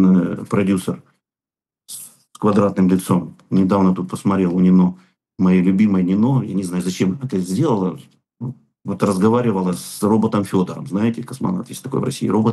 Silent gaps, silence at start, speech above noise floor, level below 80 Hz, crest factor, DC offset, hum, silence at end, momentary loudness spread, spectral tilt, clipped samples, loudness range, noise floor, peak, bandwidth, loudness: none; 0 s; over 73 dB; -60 dBFS; 16 dB; under 0.1%; none; 0 s; 16 LU; -7.5 dB/octave; under 0.1%; 4 LU; under -90 dBFS; -2 dBFS; 12.5 kHz; -18 LUFS